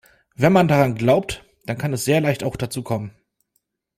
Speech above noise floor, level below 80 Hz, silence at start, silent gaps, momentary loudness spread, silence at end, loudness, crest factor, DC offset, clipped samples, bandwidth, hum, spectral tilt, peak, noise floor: 53 dB; -50 dBFS; 0.4 s; none; 15 LU; 0.9 s; -20 LUFS; 18 dB; under 0.1%; under 0.1%; 16 kHz; none; -6 dB/octave; -2 dBFS; -72 dBFS